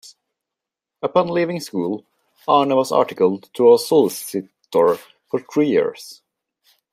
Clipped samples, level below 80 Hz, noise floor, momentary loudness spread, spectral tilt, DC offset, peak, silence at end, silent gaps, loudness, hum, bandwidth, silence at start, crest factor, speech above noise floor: under 0.1%; -70 dBFS; -85 dBFS; 14 LU; -5.5 dB/octave; under 0.1%; -2 dBFS; 0.8 s; none; -19 LUFS; none; 15.5 kHz; 1.05 s; 18 dB; 67 dB